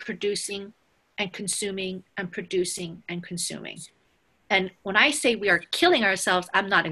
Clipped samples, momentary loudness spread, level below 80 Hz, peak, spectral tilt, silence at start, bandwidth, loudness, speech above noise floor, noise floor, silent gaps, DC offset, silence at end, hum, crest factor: under 0.1%; 16 LU; -64 dBFS; -6 dBFS; -2.5 dB/octave; 0 s; 13 kHz; -24 LUFS; 41 dB; -67 dBFS; none; under 0.1%; 0 s; none; 22 dB